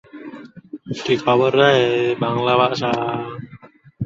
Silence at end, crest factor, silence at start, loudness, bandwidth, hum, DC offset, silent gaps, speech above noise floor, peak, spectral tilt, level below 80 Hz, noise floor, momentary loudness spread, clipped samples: 0 s; 18 dB; 0.15 s; -18 LUFS; 7.8 kHz; none; under 0.1%; none; 27 dB; -2 dBFS; -6 dB/octave; -58 dBFS; -44 dBFS; 23 LU; under 0.1%